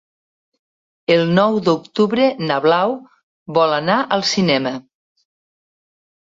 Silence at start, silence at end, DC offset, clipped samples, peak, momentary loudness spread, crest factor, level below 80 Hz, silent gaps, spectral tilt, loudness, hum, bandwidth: 1.1 s; 1.5 s; under 0.1%; under 0.1%; -2 dBFS; 8 LU; 16 dB; -60 dBFS; 3.23-3.46 s; -5.5 dB/octave; -17 LUFS; none; 7.8 kHz